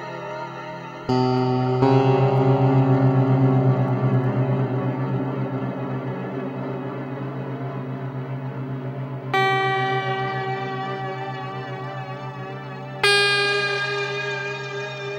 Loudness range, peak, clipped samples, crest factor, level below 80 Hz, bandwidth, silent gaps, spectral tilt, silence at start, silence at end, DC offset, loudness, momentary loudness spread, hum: 10 LU; -2 dBFS; under 0.1%; 20 dB; -58 dBFS; 10.5 kHz; none; -6.5 dB/octave; 0 s; 0 s; under 0.1%; -23 LUFS; 14 LU; none